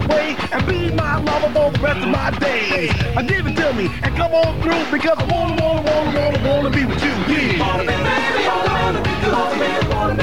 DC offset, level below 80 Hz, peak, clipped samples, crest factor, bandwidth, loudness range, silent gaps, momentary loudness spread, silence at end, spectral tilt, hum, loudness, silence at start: 2%; -30 dBFS; -6 dBFS; under 0.1%; 12 dB; 16.5 kHz; 1 LU; none; 2 LU; 0 s; -6 dB/octave; none; -18 LUFS; 0 s